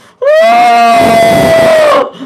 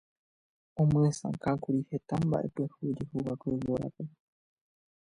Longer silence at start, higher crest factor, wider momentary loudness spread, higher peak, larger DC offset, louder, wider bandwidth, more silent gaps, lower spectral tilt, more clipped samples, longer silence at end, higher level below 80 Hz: second, 0.2 s vs 0.75 s; second, 6 dB vs 16 dB; second, 2 LU vs 10 LU; first, 0 dBFS vs -16 dBFS; neither; first, -6 LUFS vs -32 LUFS; first, 15.5 kHz vs 10.5 kHz; neither; second, -4.5 dB/octave vs -8 dB/octave; first, 0.2% vs under 0.1%; second, 0 s vs 1.05 s; first, -40 dBFS vs -60 dBFS